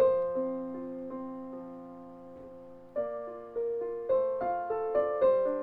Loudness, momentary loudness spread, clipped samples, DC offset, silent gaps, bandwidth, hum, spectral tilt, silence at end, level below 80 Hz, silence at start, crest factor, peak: -32 LUFS; 21 LU; under 0.1%; under 0.1%; none; 4 kHz; none; -9 dB/octave; 0 s; -66 dBFS; 0 s; 16 dB; -16 dBFS